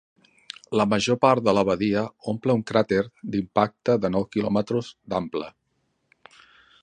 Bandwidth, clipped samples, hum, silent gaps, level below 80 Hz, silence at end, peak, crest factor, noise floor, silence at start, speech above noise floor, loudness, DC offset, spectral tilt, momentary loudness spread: 9.6 kHz; under 0.1%; none; none; -56 dBFS; 1.35 s; -4 dBFS; 20 dB; -72 dBFS; 0.7 s; 49 dB; -24 LUFS; under 0.1%; -6 dB/octave; 10 LU